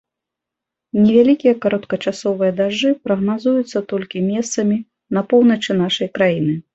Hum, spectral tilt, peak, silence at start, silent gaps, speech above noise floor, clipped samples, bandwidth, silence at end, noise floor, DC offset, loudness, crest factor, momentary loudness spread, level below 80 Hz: none; -5.5 dB/octave; -2 dBFS; 0.95 s; none; 67 dB; under 0.1%; 8.2 kHz; 0.15 s; -84 dBFS; under 0.1%; -17 LUFS; 16 dB; 9 LU; -58 dBFS